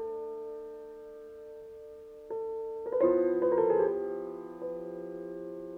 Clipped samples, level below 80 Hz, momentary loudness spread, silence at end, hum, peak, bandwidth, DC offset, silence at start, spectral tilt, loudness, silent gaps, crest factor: under 0.1%; -68 dBFS; 21 LU; 0 s; none; -14 dBFS; 3.9 kHz; under 0.1%; 0 s; -9 dB/octave; -32 LUFS; none; 18 dB